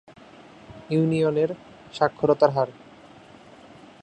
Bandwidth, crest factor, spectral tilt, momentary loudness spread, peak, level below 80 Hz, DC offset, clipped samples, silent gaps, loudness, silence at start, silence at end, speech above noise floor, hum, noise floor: 9.2 kHz; 22 dB; -7.5 dB/octave; 20 LU; -4 dBFS; -62 dBFS; under 0.1%; under 0.1%; none; -23 LUFS; 0.7 s; 1.3 s; 26 dB; none; -48 dBFS